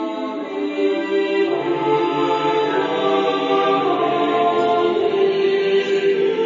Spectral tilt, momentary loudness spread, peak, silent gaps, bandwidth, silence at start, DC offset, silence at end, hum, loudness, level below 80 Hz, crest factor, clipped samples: -5.5 dB/octave; 3 LU; -6 dBFS; none; 7.6 kHz; 0 s; under 0.1%; 0 s; none; -18 LUFS; -68 dBFS; 12 dB; under 0.1%